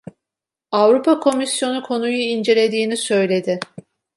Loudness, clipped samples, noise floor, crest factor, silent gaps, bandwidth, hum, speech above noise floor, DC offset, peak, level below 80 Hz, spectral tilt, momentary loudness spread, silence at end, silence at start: -18 LUFS; under 0.1%; -86 dBFS; 16 dB; none; 11.5 kHz; none; 69 dB; under 0.1%; -2 dBFS; -70 dBFS; -4 dB/octave; 8 LU; 0.55 s; 0.7 s